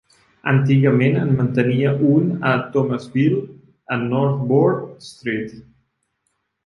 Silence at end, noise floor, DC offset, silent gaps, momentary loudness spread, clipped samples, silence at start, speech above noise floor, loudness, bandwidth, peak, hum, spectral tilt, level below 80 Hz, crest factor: 1.05 s; -72 dBFS; under 0.1%; none; 11 LU; under 0.1%; 0.45 s; 54 dB; -18 LUFS; 10.5 kHz; -2 dBFS; none; -9 dB/octave; -58 dBFS; 16 dB